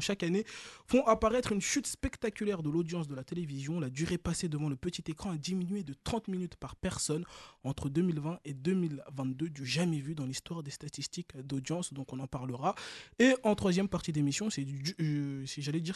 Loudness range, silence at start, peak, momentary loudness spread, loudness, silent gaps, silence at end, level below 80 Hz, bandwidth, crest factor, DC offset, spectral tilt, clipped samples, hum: 5 LU; 0 s; -14 dBFS; 11 LU; -34 LUFS; none; 0 s; -54 dBFS; 12.5 kHz; 20 dB; under 0.1%; -5 dB/octave; under 0.1%; none